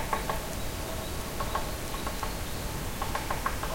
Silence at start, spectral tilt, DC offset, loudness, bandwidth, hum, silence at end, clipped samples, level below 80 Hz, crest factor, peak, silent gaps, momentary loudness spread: 0 s; -4 dB/octave; under 0.1%; -34 LUFS; 16.5 kHz; none; 0 s; under 0.1%; -38 dBFS; 18 dB; -14 dBFS; none; 3 LU